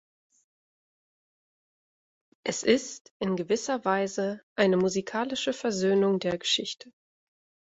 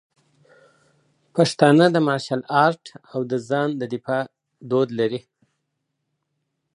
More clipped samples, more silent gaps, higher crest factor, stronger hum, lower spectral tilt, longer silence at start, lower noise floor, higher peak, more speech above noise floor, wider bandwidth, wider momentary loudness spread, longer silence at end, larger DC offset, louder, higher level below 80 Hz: neither; first, 3.01-3.05 s, 3.11-3.20 s, 4.43-4.56 s vs none; about the same, 22 dB vs 22 dB; neither; second, -4 dB/octave vs -6 dB/octave; first, 2.45 s vs 1.35 s; first, under -90 dBFS vs -77 dBFS; second, -8 dBFS vs 0 dBFS; first, over 63 dB vs 57 dB; second, 8 kHz vs 11 kHz; second, 10 LU vs 14 LU; second, 0.85 s vs 1.55 s; neither; second, -27 LUFS vs -21 LUFS; about the same, -68 dBFS vs -72 dBFS